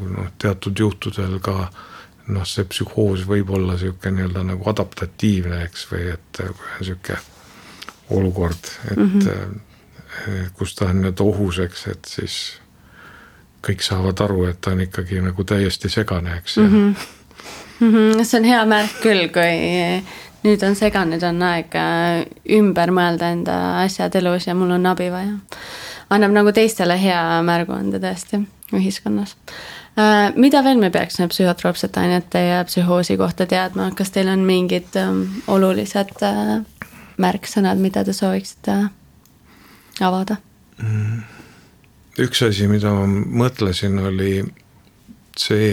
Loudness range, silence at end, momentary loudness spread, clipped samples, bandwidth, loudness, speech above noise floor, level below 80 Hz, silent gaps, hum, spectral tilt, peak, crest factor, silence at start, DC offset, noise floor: 7 LU; 0 s; 15 LU; under 0.1%; 16.5 kHz; -19 LUFS; 32 dB; -44 dBFS; none; none; -6 dB/octave; 0 dBFS; 18 dB; 0 s; under 0.1%; -50 dBFS